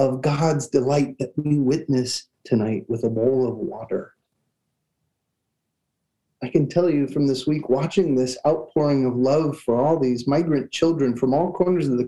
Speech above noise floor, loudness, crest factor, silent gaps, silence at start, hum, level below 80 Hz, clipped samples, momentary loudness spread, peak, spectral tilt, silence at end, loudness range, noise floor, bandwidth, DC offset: 57 dB; -22 LUFS; 18 dB; none; 0 s; none; -60 dBFS; under 0.1%; 6 LU; -4 dBFS; -7 dB/octave; 0 s; 7 LU; -78 dBFS; 12 kHz; 0.2%